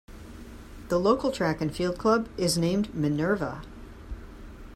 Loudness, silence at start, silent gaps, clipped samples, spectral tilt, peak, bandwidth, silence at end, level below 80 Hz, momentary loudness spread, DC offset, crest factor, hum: -27 LUFS; 0.1 s; none; under 0.1%; -5.5 dB/octave; -8 dBFS; 15.5 kHz; 0 s; -46 dBFS; 21 LU; under 0.1%; 20 dB; none